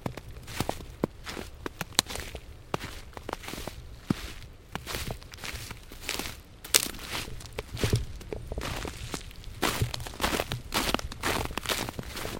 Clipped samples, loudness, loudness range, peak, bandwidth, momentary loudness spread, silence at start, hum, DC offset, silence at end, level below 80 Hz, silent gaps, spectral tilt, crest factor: under 0.1%; -33 LUFS; 7 LU; 0 dBFS; 17 kHz; 14 LU; 0 s; none; under 0.1%; 0 s; -44 dBFS; none; -3 dB/octave; 34 dB